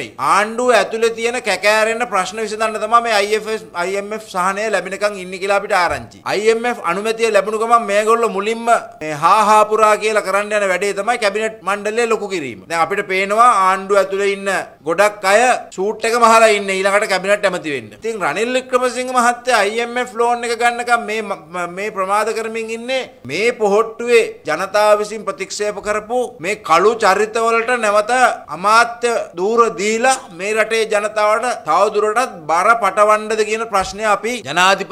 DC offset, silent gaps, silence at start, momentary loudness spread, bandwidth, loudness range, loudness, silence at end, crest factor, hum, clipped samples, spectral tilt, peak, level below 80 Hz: under 0.1%; none; 0 s; 9 LU; 15.5 kHz; 4 LU; -16 LUFS; 0 s; 16 dB; none; under 0.1%; -3 dB/octave; 0 dBFS; -56 dBFS